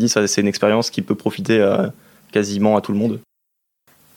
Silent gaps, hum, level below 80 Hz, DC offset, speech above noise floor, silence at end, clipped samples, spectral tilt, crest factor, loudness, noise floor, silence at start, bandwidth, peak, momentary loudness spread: none; none; -66 dBFS; under 0.1%; 57 dB; 0.95 s; under 0.1%; -4.5 dB/octave; 18 dB; -18 LUFS; -75 dBFS; 0 s; 16.5 kHz; -2 dBFS; 7 LU